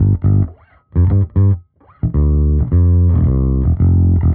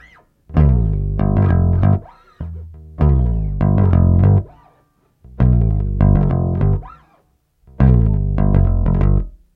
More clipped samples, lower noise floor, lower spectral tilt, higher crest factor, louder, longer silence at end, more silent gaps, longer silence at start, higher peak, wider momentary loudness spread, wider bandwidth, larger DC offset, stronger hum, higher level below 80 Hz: neither; second, -35 dBFS vs -59 dBFS; first, -14 dB/octave vs -12 dB/octave; second, 8 dB vs 14 dB; about the same, -15 LUFS vs -16 LUFS; second, 0 s vs 0.2 s; neither; second, 0 s vs 0.5 s; second, -4 dBFS vs 0 dBFS; about the same, 8 LU vs 9 LU; second, 2.1 kHz vs 3.3 kHz; first, 0.5% vs under 0.1%; neither; about the same, -20 dBFS vs -20 dBFS